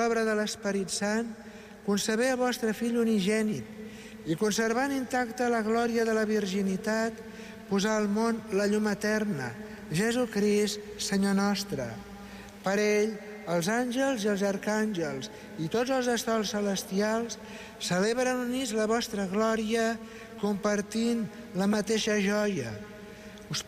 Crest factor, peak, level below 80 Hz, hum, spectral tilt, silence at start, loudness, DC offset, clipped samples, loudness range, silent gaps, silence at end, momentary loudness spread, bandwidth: 12 dB; -16 dBFS; -60 dBFS; none; -4.5 dB/octave; 0 s; -29 LUFS; under 0.1%; under 0.1%; 1 LU; none; 0 s; 13 LU; 15.5 kHz